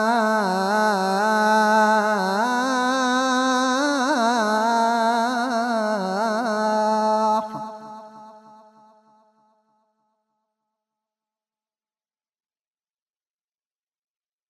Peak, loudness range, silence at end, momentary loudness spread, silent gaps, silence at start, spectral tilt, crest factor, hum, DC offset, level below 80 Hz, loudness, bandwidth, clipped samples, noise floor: -8 dBFS; 7 LU; 6.1 s; 6 LU; none; 0 s; -4 dB/octave; 14 dB; none; under 0.1%; -76 dBFS; -20 LUFS; 13.5 kHz; under 0.1%; under -90 dBFS